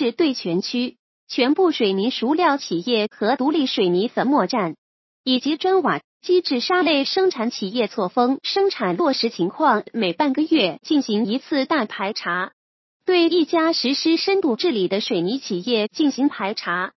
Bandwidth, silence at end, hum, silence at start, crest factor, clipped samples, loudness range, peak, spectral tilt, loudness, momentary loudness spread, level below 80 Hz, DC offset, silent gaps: 6.2 kHz; 0.1 s; none; 0 s; 16 dB; under 0.1%; 1 LU; -4 dBFS; -5 dB/octave; -20 LUFS; 6 LU; -76 dBFS; under 0.1%; 0.99-1.27 s, 4.78-5.24 s, 6.04-6.20 s, 12.53-13.00 s